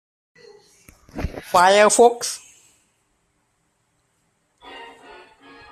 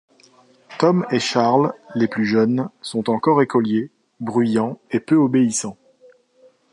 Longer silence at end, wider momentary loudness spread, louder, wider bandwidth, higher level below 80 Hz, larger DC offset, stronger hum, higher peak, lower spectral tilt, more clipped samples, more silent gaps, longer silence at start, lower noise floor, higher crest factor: second, 0.85 s vs 1 s; first, 27 LU vs 9 LU; about the same, -17 LUFS vs -19 LUFS; first, 15 kHz vs 11.5 kHz; first, -46 dBFS vs -66 dBFS; neither; neither; about the same, -2 dBFS vs -2 dBFS; second, -2.5 dB/octave vs -5.5 dB/octave; neither; neither; first, 1.15 s vs 0.7 s; first, -68 dBFS vs -55 dBFS; about the same, 20 dB vs 18 dB